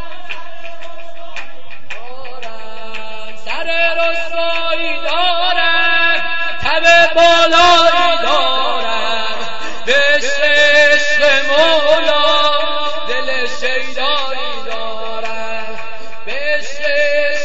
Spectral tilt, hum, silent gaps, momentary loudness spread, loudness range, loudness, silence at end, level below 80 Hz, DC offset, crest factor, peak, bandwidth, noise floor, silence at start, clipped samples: -2 dB/octave; none; none; 22 LU; 10 LU; -13 LUFS; 0 s; -46 dBFS; 20%; 16 dB; 0 dBFS; 8 kHz; -37 dBFS; 0 s; under 0.1%